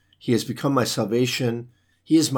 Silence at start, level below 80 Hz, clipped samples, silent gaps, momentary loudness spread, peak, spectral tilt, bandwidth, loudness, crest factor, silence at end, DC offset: 0.25 s; -66 dBFS; under 0.1%; none; 4 LU; -8 dBFS; -5 dB/octave; 19 kHz; -23 LUFS; 16 dB; 0 s; under 0.1%